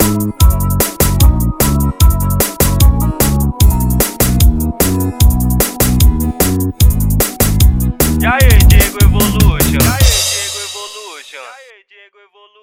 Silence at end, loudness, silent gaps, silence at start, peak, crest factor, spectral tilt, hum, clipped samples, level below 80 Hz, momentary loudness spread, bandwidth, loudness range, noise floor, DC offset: 1.05 s; -12 LUFS; none; 0 s; 0 dBFS; 10 dB; -4.5 dB/octave; none; 0.3%; -14 dBFS; 5 LU; 18 kHz; 2 LU; -46 dBFS; under 0.1%